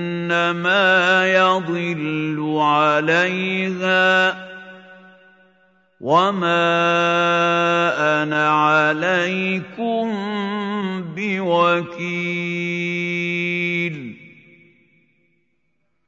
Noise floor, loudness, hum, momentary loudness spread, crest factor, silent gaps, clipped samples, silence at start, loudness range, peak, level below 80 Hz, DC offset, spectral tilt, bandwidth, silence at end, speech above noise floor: -72 dBFS; -18 LUFS; none; 9 LU; 18 dB; none; under 0.1%; 0 s; 6 LU; -2 dBFS; -72 dBFS; under 0.1%; -5.5 dB/octave; 7.8 kHz; 1.8 s; 53 dB